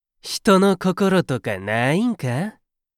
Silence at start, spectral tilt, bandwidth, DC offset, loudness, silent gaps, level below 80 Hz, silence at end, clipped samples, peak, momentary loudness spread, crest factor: 0.25 s; -6 dB/octave; 15.5 kHz; under 0.1%; -20 LUFS; none; -56 dBFS; 0.5 s; under 0.1%; -2 dBFS; 10 LU; 18 dB